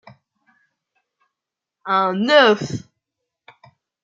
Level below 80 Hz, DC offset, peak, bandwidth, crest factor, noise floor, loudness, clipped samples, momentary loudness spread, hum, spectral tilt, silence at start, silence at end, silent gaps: -66 dBFS; under 0.1%; -2 dBFS; 7.8 kHz; 22 dB; -85 dBFS; -16 LUFS; under 0.1%; 19 LU; none; -5 dB/octave; 1.85 s; 1.25 s; none